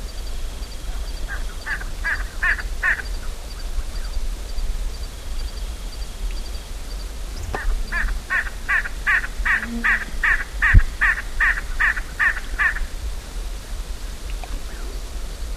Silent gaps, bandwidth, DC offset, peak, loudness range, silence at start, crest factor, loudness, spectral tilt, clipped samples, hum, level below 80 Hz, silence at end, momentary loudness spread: none; 15 kHz; 0.3%; 0 dBFS; 13 LU; 0 s; 22 dB; -24 LUFS; -3.5 dB/octave; under 0.1%; none; -26 dBFS; 0 s; 14 LU